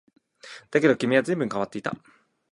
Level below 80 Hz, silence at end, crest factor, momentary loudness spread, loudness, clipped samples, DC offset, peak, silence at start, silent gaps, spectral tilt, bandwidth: -68 dBFS; 0.55 s; 20 dB; 21 LU; -24 LUFS; under 0.1%; under 0.1%; -6 dBFS; 0.45 s; none; -6 dB/octave; 11.5 kHz